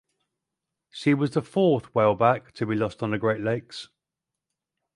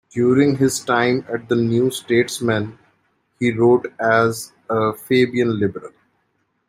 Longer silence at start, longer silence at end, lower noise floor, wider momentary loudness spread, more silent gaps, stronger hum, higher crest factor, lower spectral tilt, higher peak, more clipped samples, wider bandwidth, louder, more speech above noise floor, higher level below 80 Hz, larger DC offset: first, 0.95 s vs 0.15 s; first, 1.1 s vs 0.8 s; first, -87 dBFS vs -68 dBFS; about the same, 10 LU vs 8 LU; neither; neither; about the same, 20 dB vs 16 dB; first, -7.5 dB/octave vs -5.5 dB/octave; second, -6 dBFS vs -2 dBFS; neither; second, 11.5 kHz vs 16 kHz; second, -24 LUFS vs -18 LUFS; first, 63 dB vs 50 dB; about the same, -62 dBFS vs -58 dBFS; neither